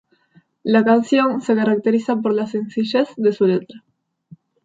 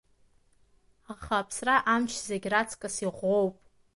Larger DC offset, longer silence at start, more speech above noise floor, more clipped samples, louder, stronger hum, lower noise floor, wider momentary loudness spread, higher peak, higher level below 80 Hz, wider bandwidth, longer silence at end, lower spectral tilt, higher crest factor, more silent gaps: neither; second, 0.65 s vs 1.1 s; about the same, 39 dB vs 36 dB; neither; first, -18 LUFS vs -28 LUFS; neither; second, -56 dBFS vs -64 dBFS; about the same, 8 LU vs 9 LU; first, -4 dBFS vs -10 dBFS; second, -70 dBFS vs -60 dBFS; second, 7.8 kHz vs 11.5 kHz; first, 0.85 s vs 0.45 s; first, -7 dB/octave vs -3.5 dB/octave; about the same, 16 dB vs 20 dB; neither